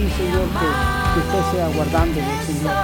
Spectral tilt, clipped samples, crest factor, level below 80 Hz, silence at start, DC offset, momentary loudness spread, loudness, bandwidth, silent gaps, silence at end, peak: -5.5 dB/octave; under 0.1%; 16 dB; -28 dBFS; 0 s; under 0.1%; 3 LU; -20 LUFS; 18 kHz; none; 0 s; -4 dBFS